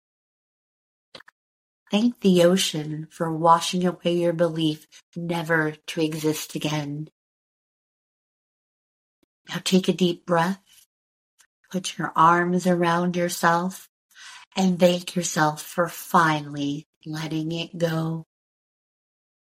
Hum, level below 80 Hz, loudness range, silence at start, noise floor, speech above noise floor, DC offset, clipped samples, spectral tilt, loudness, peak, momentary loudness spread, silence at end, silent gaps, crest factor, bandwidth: none; -70 dBFS; 7 LU; 1.15 s; under -90 dBFS; over 67 dB; under 0.1%; under 0.1%; -5 dB/octave; -23 LUFS; -4 dBFS; 15 LU; 1.25 s; 1.32-1.86 s, 5.03-5.12 s, 7.12-9.45 s, 10.86-11.38 s, 11.46-11.64 s, 13.89-14.09 s, 14.47-14.51 s, 16.86-17.01 s; 22 dB; 16 kHz